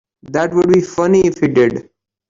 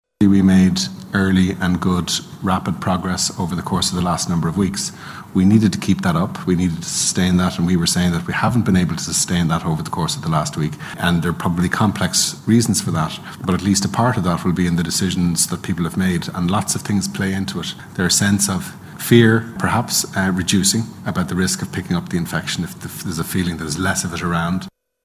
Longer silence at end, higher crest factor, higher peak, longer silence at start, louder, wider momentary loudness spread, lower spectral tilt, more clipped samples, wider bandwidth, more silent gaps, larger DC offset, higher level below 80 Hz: about the same, 0.45 s vs 0.35 s; second, 12 dB vs 18 dB; about the same, -2 dBFS vs 0 dBFS; about the same, 0.3 s vs 0.2 s; first, -14 LUFS vs -18 LUFS; about the same, 7 LU vs 8 LU; first, -6.5 dB/octave vs -4.5 dB/octave; neither; second, 7.6 kHz vs 16 kHz; neither; neither; second, -48 dBFS vs -38 dBFS